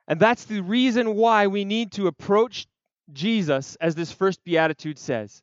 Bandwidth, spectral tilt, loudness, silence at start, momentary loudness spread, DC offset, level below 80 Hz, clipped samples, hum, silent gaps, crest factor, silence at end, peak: 7.8 kHz; -5.5 dB/octave; -23 LUFS; 0.1 s; 9 LU; under 0.1%; -70 dBFS; under 0.1%; none; none; 18 dB; 0.15 s; -4 dBFS